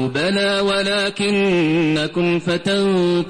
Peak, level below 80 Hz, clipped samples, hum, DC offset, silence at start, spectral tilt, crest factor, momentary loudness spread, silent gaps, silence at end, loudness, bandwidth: -8 dBFS; -52 dBFS; under 0.1%; none; under 0.1%; 0 s; -5.5 dB/octave; 8 dB; 2 LU; none; 0 s; -18 LUFS; 10.5 kHz